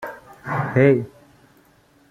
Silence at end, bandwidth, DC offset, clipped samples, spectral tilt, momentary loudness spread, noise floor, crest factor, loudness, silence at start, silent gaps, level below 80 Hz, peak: 1 s; 14 kHz; under 0.1%; under 0.1%; -9 dB/octave; 21 LU; -56 dBFS; 20 dB; -19 LUFS; 0 s; none; -58 dBFS; -4 dBFS